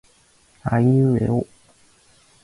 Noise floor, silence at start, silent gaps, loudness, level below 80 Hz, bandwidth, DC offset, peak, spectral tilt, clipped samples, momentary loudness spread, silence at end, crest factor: -57 dBFS; 0.65 s; none; -20 LUFS; -48 dBFS; 11 kHz; under 0.1%; -8 dBFS; -10 dB/octave; under 0.1%; 14 LU; 1 s; 14 dB